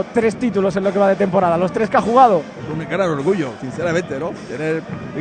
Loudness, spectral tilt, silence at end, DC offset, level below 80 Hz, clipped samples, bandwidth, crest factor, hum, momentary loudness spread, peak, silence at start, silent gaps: -18 LUFS; -6.5 dB/octave; 0 s; under 0.1%; -50 dBFS; under 0.1%; 9.4 kHz; 18 dB; none; 12 LU; 0 dBFS; 0 s; none